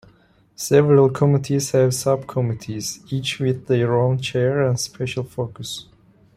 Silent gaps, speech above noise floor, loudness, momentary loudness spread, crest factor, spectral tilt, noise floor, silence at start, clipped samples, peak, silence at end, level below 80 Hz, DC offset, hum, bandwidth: none; 35 dB; -20 LUFS; 13 LU; 18 dB; -5.5 dB/octave; -55 dBFS; 0.6 s; under 0.1%; -2 dBFS; 0.55 s; -56 dBFS; under 0.1%; none; 15.5 kHz